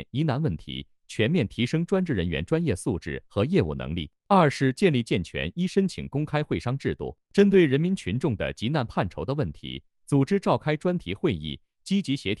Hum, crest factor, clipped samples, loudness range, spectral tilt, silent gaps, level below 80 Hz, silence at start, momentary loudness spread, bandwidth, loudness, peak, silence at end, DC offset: none; 18 dB; under 0.1%; 2 LU; -7 dB/octave; none; -48 dBFS; 0 s; 12 LU; 12 kHz; -26 LUFS; -8 dBFS; 0.05 s; under 0.1%